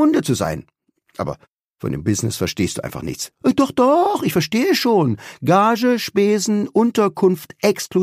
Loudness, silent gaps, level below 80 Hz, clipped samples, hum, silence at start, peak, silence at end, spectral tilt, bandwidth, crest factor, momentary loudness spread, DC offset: -18 LUFS; 1.64-1.69 s; -50 dBFS; under 0.1%; none; 0 s; -2 dBFS; 0 s; -5.5 dB/octave; 15.5 kHz; 16 dB; 13 LU; under 0.1%